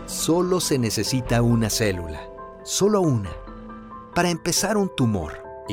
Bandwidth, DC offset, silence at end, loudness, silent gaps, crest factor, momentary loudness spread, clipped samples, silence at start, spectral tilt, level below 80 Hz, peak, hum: 17 kHz; under 0.1%; 0 s; -22 LUFS; none; 16 dB; 18 LU; under 0.1%; 0 s; -4.5 dB/octave; -42 dBFS; -8 dBFS; none